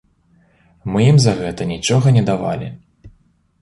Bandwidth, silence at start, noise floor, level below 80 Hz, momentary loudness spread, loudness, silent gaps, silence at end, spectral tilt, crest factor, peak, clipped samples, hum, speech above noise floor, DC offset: 11.5 kHz; 0.85 s; -56 dBFS; -46 dBFS; 14 LU; -16 LUFS; none; 0.55 s; -6 dB/octave; 16 dB; -2 dBFS; under 0.1%; none; 41 dB; under 0.1%